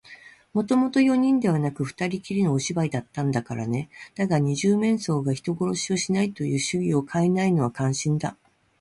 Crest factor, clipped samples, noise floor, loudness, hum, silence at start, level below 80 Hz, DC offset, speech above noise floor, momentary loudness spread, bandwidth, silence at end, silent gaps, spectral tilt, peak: 14 dB; under 0.1%; -49 dBFS; -24 LUFS; none; 0.1 s; -60 dBFS; under 0.1%; 25 dB; 8 LU; 11.5 kHz; 0.5 s; none; -6 dB/octave; -10 dBFS